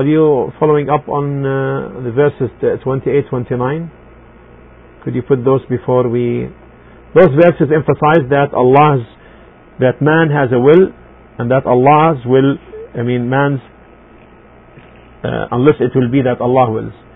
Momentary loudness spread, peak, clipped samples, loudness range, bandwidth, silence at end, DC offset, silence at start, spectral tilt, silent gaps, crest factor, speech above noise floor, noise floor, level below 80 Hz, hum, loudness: 13 LU; 0 dBFS; under 0.1%; 6 LU; 3.9 kHz; 0.2 s; under 0.1%; 0 s; -11 dB/octave; none; 14 dB; 29 dB; -41 dBFS; -44 dBFS; none; -13 LUFS